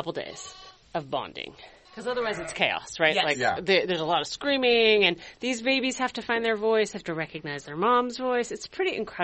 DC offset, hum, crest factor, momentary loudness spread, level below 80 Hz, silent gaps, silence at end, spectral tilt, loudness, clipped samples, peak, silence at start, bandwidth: under 0.1%; none; 22 dB; 14 LU; -60 dBFS; none; 0 s; -3.5 dB/octave; -26 LUFS; under 0.1%; -6 dBFS; 0 s; 8.4 kHz